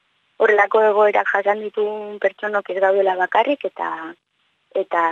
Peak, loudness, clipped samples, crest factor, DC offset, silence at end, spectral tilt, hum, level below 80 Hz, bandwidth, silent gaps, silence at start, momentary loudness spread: -2 dBFS; -19 LUFS; under 0.1%; 18 dB; under 0.1%; 0 s; -5 dB/octave; none; -74 dBFS; 7 kHz; none; 0.4 s; 12 LU